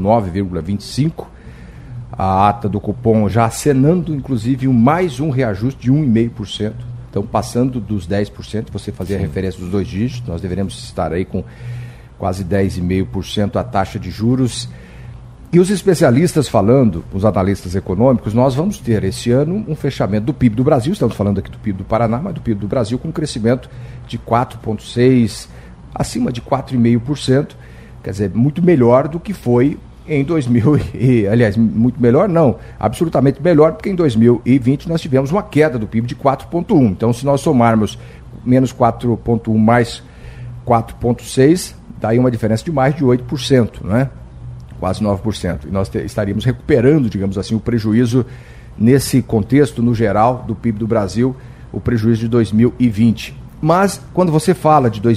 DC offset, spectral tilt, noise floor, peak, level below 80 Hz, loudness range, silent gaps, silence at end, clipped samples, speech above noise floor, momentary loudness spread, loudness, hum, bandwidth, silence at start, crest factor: under 0.1%; -7 dB/octave; -35 dBFS; 0 dBFS; -38 dBFS; 6 LU; none; 0 s; under 0.1%; 20 dB; 12 LU; -16 LUFS; none; 14.5 kHz; 0 s; 16 dB